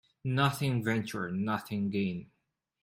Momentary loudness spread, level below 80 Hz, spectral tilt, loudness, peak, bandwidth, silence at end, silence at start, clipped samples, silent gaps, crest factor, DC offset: 7 LU; -66 dBFS; -6 dB/octave; -32 LUFS; -14 dBFS; 16 kHz; 0.6 s; 0.25 s; under 0.1%; none; 20 dB; under 0.1%